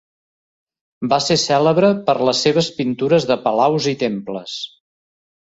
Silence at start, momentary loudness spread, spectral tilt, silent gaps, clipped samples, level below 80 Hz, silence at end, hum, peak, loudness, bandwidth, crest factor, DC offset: 1 s; 13 LU; -4.5 dB/octave; none; under 0.1%; -58 dBFS; 0.95 s; none; -2 dBFS; -17 LUFS; 8 kHz; 18 dB; under 0.1%